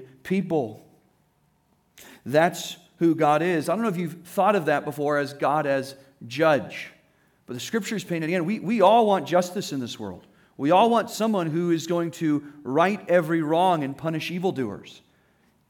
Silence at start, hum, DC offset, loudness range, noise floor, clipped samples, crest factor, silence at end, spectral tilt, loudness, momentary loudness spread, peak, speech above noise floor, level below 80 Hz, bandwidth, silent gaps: 0 s; none; under 0.1%; 4 LU; -66 dBFS; under 0.1%; 18 dB; 0.75 s; -5.5 dB/octave; -24 LUFS; 15 LU; -6 dBFS; 43 dB; -72 dBFS; 18.5 kHz; none